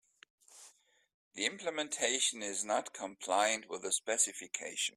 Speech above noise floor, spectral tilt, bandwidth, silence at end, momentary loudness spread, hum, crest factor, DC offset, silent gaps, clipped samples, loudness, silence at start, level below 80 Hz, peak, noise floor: 29 dB; 0.5 dB/octave; 15.5 kHz; 0.05 s; 10 LU; none; 22 dB; under 0.1%; 1.14-1.31 s; under 0.1%; -34 LUFS; 0.5 s; -82 dBFS; -16 dBFS; -64 dBFS